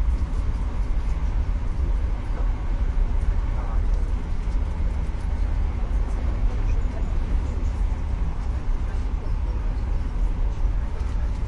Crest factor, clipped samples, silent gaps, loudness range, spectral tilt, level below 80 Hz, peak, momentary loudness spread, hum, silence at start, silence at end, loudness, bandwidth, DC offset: 12 dB; under 0.1%; none; 1 LU; -7.5 dB/octave; -24 dBFS; -10 dBFS; 2 LU; none; 0 s; 0 s; -28 LUFS; 7 kHz; under 0.1%